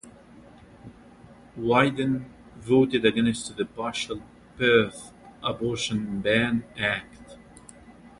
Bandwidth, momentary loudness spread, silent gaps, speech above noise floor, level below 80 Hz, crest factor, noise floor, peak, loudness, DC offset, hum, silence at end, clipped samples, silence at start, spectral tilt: 11.5 kHz; 18 LU; none; 25 dB; -56 dBFS; 22 dB; -50 dBFS; -6 dBFS; -25 LUFS; under 0.1%; none; 0.1 s; under 0.1%; 0.05 s; -5 dB/octave